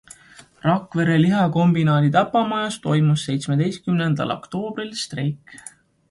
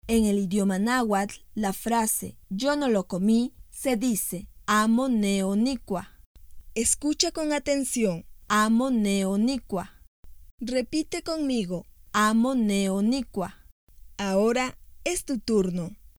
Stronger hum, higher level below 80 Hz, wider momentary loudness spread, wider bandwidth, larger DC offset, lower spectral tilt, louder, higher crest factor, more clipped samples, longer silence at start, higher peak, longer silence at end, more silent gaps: neither; second, -58 dBFS vs -50 dBFS; about the same, 10 LU vs 11 LU; second, 11.5 kHz vs 20 kHz; neither; first, -6.5 dB/octave vs -4.5 dB/octave; first, -20 LUFS vs -26 LUFS; about the same, 16 dB vs 20 dB; neither; first, 0.65 s vs 0.05 s; about the same, -4 dBFS vs -6 dBFS; first, 0.4 s vs 0.25 s; second, none vs 6.26-6.35 s, 10.07-10.23 s, 10.51-10.58 s, 13.72-13.87 s